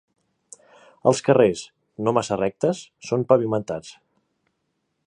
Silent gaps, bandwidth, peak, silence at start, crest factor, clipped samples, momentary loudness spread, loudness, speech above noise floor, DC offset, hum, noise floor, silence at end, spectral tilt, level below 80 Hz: none; 11 kHz; -2 dBFS; 1.05 s; 22 dB; under 0.1%; 14 LU; -22 LUFS; 53 dB; under 0.1%; none; -75 dBFS; 1.15 s; -6 dB/octave; -62 dBFS